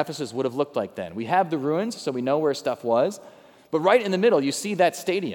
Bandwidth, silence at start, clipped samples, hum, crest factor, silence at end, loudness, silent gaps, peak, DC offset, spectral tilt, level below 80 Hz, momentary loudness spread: 19 kHz; 0 s; under 0.1%; none; 18 dB; 0 s; -24 LUFS; none; -6 dBFS; under 0.1%; -5 dB/octave; -76 dBFS; 9 LU